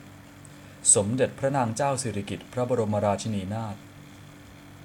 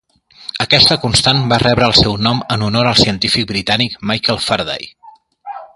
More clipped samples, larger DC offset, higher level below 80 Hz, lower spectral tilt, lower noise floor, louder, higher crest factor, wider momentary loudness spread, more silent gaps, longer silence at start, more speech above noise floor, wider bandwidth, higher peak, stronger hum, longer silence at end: neither; neither; second, -60 dBFS vs -36 dBFS; about the same, -4 dB/octave vs -4 dB/octave; first, -47 dBFS vs -36 dBFS; second, -25 LUFS vs -12 LUFS; first, 22 dB vs 14 dB; about the same, 17 LU vs 16 LU; neither; second, 0 s vs 0.4 s; about the same, 21 dB vs 22 dB; first, 18.5 kHz vs 11.5 kHz; second, -6 dBFS vs 0 dBFS; neither; about the same, 0 s vs 0.1 s